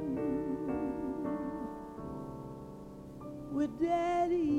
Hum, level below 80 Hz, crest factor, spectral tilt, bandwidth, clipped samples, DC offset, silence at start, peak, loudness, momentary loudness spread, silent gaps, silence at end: none; -56 dBFS; 14 dB; -7.5 dB/octave; 12 kHz; under 0.1%; under 0.1%; 0 s; -22 dBFS; -36 LUFS; 16 LU; none; 0 s